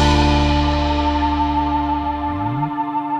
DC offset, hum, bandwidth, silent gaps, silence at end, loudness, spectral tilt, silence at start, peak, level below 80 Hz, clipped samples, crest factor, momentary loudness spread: under 0.1%; none; 9 kHz; none; 0 s; -19 LUFS; -6 dB/octave; 0 s; -4 dBFS; -24 dBFS; under 0.1%; 14 dB; 7 LU